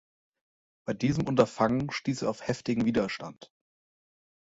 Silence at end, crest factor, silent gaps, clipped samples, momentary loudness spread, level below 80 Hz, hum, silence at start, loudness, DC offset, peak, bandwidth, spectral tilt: 0.95 s; 24 dB; none; under 0.1%; 12 LU; -58 dBFS; none; 0.85 s; -29 LUFS; under 0.1%; -6 dBFS; 8 kHz; -6.5 dB/octave